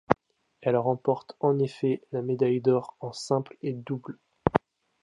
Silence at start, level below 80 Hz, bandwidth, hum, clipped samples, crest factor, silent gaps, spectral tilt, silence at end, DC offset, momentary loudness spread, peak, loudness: 0.1 s; -56 dBFS; 11 kHz; none; under 0.1%; 26 dB; none; -7 dB/octave; 0.45 s; under 0.1%; 10 LU; -2 dBFS; -28 LUFS